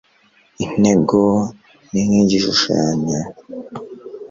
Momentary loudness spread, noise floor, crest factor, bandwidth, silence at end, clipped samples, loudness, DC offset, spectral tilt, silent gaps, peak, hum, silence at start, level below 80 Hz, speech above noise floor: 19 LU; -55 dBFS; 16 dB; 7.6 kHz; 0.05 s; under 0.1%; -17 LUFS; under 0.1%; -5 dB/octave; none; -2 dBFS; none; 0.6 s; -48 dBFS; 39 dB